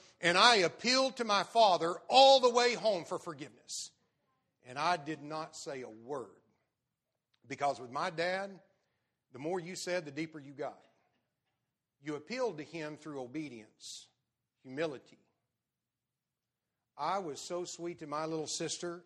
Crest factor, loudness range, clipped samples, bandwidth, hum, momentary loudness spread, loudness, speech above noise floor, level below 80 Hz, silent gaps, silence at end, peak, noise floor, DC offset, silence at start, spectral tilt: 26 dB; 16 LU; under 0.1%; 11.5 kHz; none; 21 LU; -32 LUFS; over 57 dB; -84 dBFS; none; 0.05 s; -8 dBFS; under -90 dBFS; under 0.1%; 0.2 s; -2.5 dB/octave